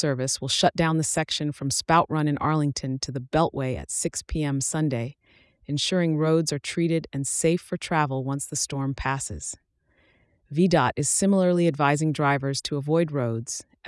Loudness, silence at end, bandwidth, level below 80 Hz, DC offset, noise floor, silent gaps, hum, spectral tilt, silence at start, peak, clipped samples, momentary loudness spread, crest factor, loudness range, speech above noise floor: -25 LUFS; 0 s; 12 kHz; -50 dBFS; under 0.1%; -65 dBFS; none; none; -4.5 dB/octave; 0 s; -6 dBFS; under 0.1%; 9 LU; 18 dB; 4 LU; 40 dB